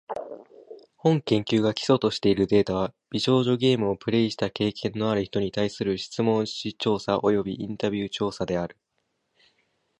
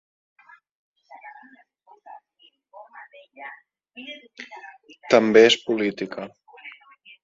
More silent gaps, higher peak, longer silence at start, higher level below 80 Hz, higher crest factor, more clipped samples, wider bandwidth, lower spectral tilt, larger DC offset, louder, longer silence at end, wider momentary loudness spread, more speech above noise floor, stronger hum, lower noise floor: neither; second, -6 dBFS vs -2 dBFS; second, 0.1 s vs 1.25 s; first, -56 dBFS vs -70 dBFS; second, 18 dB vs 24 dB; neither; first, 10.5 kHz vs 7.8 kHz; first, -6 dB/octave vs -4 dB/octave; neither; second, -25 LUFS vs -18 LUFS; first, 1.25 s vs 0.55 s; second, 8 LU vs 30 LU; first, 51 dB vs 39 dB; neither; first, -76 dBFS vs -61 dBFS